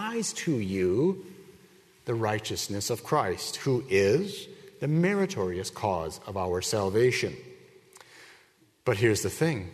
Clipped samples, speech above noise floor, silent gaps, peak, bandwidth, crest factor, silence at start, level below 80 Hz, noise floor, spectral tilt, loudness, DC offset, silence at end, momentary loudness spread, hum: under 0.1%; 34 dB; none; -10 dBFS; 13.5 kHz; 18 dB; 0 s; -60 dBFS; -62 dBFS; -5 dB/octave; -28 LUFS; under 0.1%; 0 s; 11 LU; none